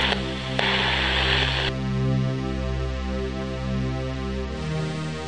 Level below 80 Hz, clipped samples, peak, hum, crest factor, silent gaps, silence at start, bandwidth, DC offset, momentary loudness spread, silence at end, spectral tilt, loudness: -34 dBFS; under 0.1%; -4 dBFS; none; 20 dB; none; 0 s; 10 kHz; 0.4%; 9 LU; 0 s; -5.5 dB/octave; -25 LUFS